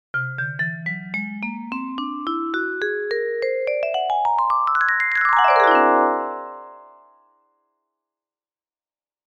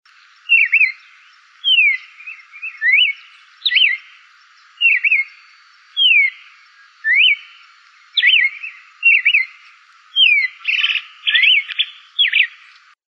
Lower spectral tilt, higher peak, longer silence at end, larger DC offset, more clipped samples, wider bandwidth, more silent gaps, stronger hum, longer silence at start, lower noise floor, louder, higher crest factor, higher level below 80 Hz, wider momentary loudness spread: first, -6.5 dB/octave vs 12 dB/octave; about the same, -2 dBFS vs -2 dBFS; first, 2.4 s vs 0.6 s; neither; neither; first, 8.6 kHz vs 7.4 kHz; neither; neither; second, 0.15 s vs 0.5 s; first, under -90 dBFS vs -49 dBFS; second, -20 LUFS vs -13 LUFS; about the same, 20 dB vs 16 dB; first, -64 dBFS vs under -90 dBFS; about the same, 14 LU vs 15 LU